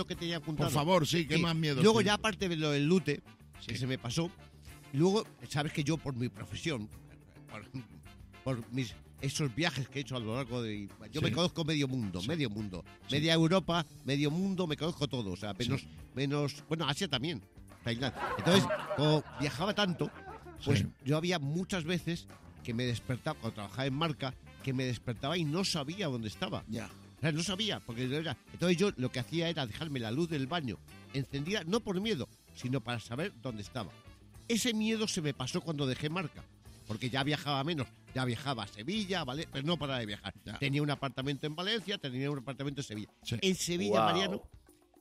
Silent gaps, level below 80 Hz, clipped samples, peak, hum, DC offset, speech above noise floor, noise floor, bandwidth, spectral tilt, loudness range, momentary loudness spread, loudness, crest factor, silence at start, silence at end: none; -60 dBFS; under 0.1%; -12 dBFS; none; under 0.1%; 20 dB; -54 dBFS; 15.5 kHz; -5 dB/octave; 5 LU; 13 LU; -34 LUFS; 22 dB; 0 s; 0.4 s